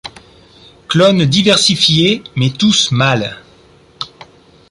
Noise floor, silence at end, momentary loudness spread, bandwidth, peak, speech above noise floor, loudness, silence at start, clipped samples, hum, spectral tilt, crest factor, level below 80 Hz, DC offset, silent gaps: -45 dBFS; 0.65 s; 18 LU; 11.5 kHz; 0 dBFS; 34 dB; -11 LUFS; 0.05 s; under 0.1%; none; -4 dB/octave; 14 dB; -46 dBFS; under 0.1%; none